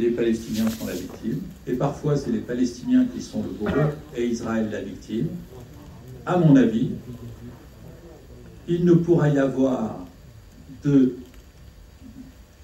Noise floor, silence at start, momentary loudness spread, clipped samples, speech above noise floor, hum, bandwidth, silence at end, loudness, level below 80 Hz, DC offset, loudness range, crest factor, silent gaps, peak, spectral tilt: -46 dBFS; 0 s; 24 LU; under 0.1%; 24 dB; none; 16 kHz; 0 s; -23 LUFS; -48 dBFS; under 0.1%; 3 LU; 18 dB; none; -6 dBFS; -7.5 dB/octave